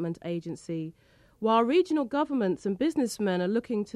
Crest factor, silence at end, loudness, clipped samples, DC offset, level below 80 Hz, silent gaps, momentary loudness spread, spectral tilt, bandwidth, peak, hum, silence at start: 16 dB; 0.05 s; -28 LUFS; under 0.1%; under 0.1%; -66 dBFS; none; 12 LU; -6 dB/octave; 13 kHz; -12 dBFS; none; 0 s